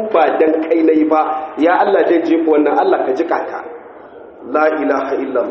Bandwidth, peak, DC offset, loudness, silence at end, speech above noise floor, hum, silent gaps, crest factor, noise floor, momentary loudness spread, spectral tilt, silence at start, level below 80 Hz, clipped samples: 6.2 kHz; 0 dBFS; under 0.1%; -14 LUFS; 0 s; 22 dB; none; none; 14 dB; -36 dBFS; 9 LU; -3 dB/octave; 0 s; -62 dBFS; under 0.1%